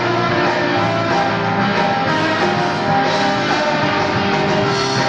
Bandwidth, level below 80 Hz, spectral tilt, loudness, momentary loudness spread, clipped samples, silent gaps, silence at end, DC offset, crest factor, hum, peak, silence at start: 9.6 kHz; -48 dBFS; -5 dB/octave; -16 LUFS; 1 LU; under 0.1%; none; 0 s; under 0.1%; 12 dB; none; -4 dBFS; 0 s